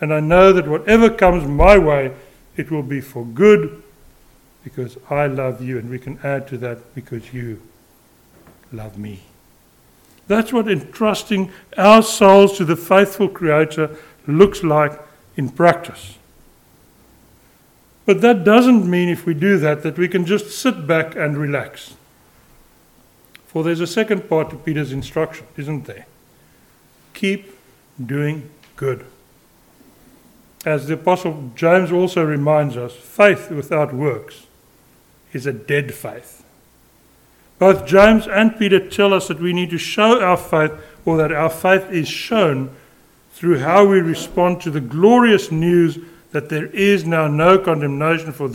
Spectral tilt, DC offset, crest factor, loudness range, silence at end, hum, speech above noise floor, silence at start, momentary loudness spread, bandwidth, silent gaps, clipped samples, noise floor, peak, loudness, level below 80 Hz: -6 dB/octave; under 0.1%; 18 dB; 13 LU; 0 s; none; 37 dB; 0 s; 19 LU; 17.5 kHz; none; under 0.1%; -52 dBFS; 0 dBFS; -16 LUFS; -38 dBFS